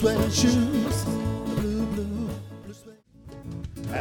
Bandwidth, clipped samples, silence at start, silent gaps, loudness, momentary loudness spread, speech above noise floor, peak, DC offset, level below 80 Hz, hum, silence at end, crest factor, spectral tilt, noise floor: 19.5 kHz; under 0.1%; 0 s; none; -26 LUFS; 22 LU; 28 dB; -8 dBFS; under 0.1%; -40 dBFS; none; 0 s; 18 dB; -5.5 dB/octave; -50 dBFS